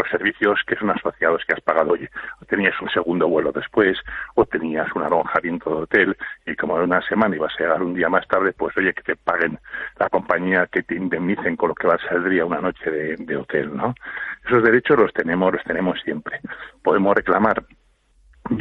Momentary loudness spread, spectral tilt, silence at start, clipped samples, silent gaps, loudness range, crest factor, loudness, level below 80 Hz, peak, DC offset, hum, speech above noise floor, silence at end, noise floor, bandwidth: 9 LU; -8.5 dB/octave; 0 s; under 0.1%; none; 2 LU; 18 dB; -20 LUFS; -52 dBFS; -2 dBFS; under 0.1%; none; 36 dB; 0 s; -57 dBFS; 5.2 kHz